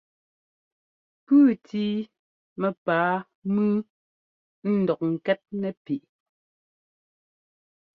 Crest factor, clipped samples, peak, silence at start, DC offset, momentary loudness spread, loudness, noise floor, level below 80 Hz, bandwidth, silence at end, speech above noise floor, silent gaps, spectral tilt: 18 dB; under 0.1%; -10 dBFS; 1.3 s; under 0.1%; 14 LU; -25 LUFS; under -90 dBFS; -72 dBFS; 4.8 kHz; 1.95 s; over 65 dB; 2.19-2.56 s, 2.77-2.86 s, 3.35-3.42 s, 3.90-4.62 s, 5.77-5.85 s; -9.5 dB/octave